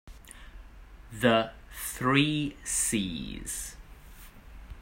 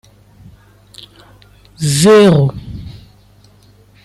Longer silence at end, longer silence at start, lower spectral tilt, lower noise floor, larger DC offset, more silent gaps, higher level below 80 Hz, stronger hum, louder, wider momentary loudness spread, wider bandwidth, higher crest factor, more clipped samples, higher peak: second, 0 s vs 1.1 s; second, 0.05 s vs 1.8 s; second, -3.5 dB/octave vs -5.5 dB/octave; about the same, -49 dBFS vs -46 dBFS; neither; neither; second, -48 dBFS vs -42 dBFS; second, none vs 50 Hz at -35 dBFS; second, -28 LUFS vs -10 LUFS; about the same, 24 LU vs 24 LU; first, 16.5 kHz vs 13 kHz; first, 22 dB vs 14 dB; neither; second, -10 dBFS vs -2 dBFS